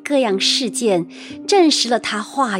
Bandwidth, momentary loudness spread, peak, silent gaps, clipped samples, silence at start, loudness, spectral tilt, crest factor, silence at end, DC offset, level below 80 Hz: 16.5 kHz; 9 LU; -4 dBFS; none; under 0.1%; 0.05 s; -17 LUFS; -3 dB/octave; 14 dB; 0 s; under 0.1%; -68 dBFS